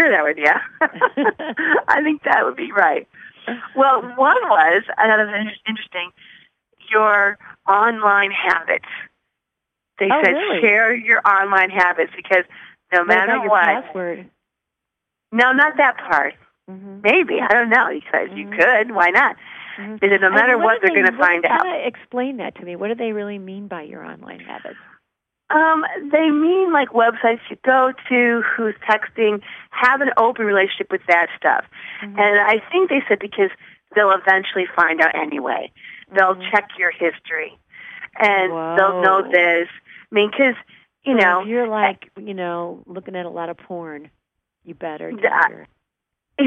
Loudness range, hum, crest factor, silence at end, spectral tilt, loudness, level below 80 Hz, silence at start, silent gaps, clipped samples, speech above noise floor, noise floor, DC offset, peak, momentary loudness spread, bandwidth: 6 LU; none; 16 dB; 0 s; -5.5 dB/octave; -17 LUFS; -68 dBFS; 0 s; none; under 0.1%; 64 dB; -82 dBFS; under 0.1%; -2 dBFS; 17 LU; 9 kHz